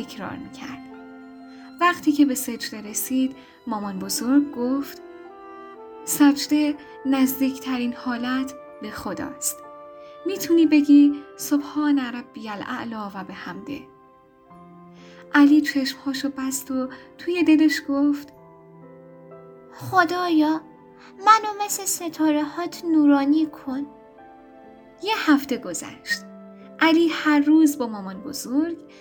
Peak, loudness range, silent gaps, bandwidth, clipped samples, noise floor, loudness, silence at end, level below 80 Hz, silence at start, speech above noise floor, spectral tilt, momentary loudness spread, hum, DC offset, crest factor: -2 dBFS; 5 LU; none; over 20 kHz; under 0.1%; -53 dBFS; -22 LUFS; 0.15 s; -64 dBFS; 0 s; 31 dB; -3.5 dB/octave; 20 LU; none; under 0.1%; 20 dB